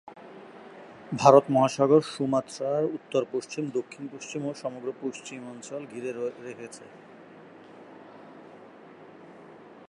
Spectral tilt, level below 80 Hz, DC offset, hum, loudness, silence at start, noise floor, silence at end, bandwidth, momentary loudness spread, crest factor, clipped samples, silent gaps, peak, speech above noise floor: -6 dB/octave; -74 dBFS; under 0.1%; none; -26 LUFS; 0.05 s; -49 dBFS; 0.3 s; 11.5 kHz; 27 LU; 26 dB; under 0.1%; none; -4 dBFS; 23 dB